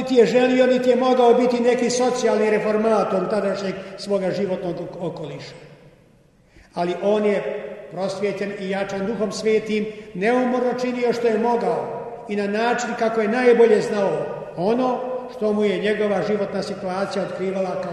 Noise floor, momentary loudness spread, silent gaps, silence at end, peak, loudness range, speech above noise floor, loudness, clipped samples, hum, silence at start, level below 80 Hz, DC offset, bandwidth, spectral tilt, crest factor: -54 dBFS; 13 LU; none; 0 s; -4 dBFS; 8 LU; 34 dB; -21 LUFS; under 0.1%; none; 0 s; -60 dBFS; under 0.1%; 11.5 kHz; -5.5 dB/octave; 18 dB